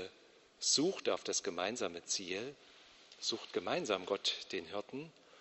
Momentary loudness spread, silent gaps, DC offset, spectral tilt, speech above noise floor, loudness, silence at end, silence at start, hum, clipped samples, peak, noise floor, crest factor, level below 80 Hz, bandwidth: 15 LU; none; under 0.1%; -1.5 dB/octave; 26 dB; -37 LUFS; 0 s; 0 s; none; under 0.1%; -18 dBFS; -64 dBFS; 22 dB; -80 dBFS; 8.2 kHz